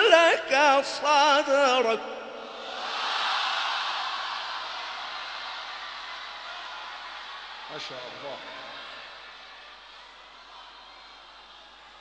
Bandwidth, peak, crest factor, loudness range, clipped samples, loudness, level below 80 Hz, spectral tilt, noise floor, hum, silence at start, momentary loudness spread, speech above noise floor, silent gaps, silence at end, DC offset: 9.8 kHz; -4 dBFS; 24 dB; 18 LU; under 0.1%; -26 LUFS; -70 dBFS; -1 dB/octave; -49 dBFS; none; 0 s; 25 LU; 24 dB; none; 0 s; under 0.1%